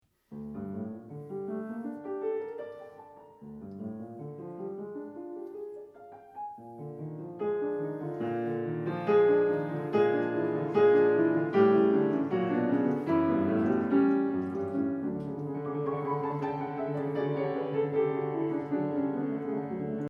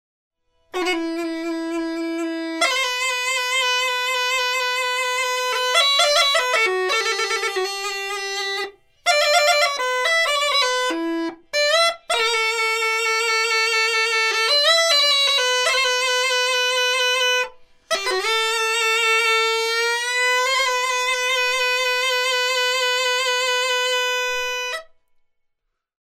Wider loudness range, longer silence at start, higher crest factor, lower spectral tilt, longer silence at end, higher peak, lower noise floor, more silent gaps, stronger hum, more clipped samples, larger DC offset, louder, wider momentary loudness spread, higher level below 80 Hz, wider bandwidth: first, 16 LU vs 4 LU; second, 0.3 s vs 0.75 s; about the same, 18 dB vs 18 dB; first, -9.5 dB/octave vs 2 dB/octave; second, 0 s vs 1.35 s; second, -10 dBFS vs -4 dBFS; second, -51 dBFS vs -75 dBFS; neither; neither; neither; neither; second, -29 LUFS vs -19 LUFS; first, 18 LU vs 10 LU; second, -70 dBFS vs -62 dBFS; second, 5.8 kHz vs 16 kHz